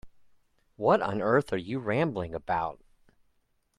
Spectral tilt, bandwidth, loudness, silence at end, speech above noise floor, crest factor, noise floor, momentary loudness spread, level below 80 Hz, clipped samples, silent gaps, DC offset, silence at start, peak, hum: -7.5 dB/octave; 11.5 kHz; -29 LUFS; 1.05 s; 44 dB; 20 dB; -72 dBFS; 7 LU; -60 dBFS; under 0.1%; none; under 0.1%; 0.05 s; -10 dBFS; none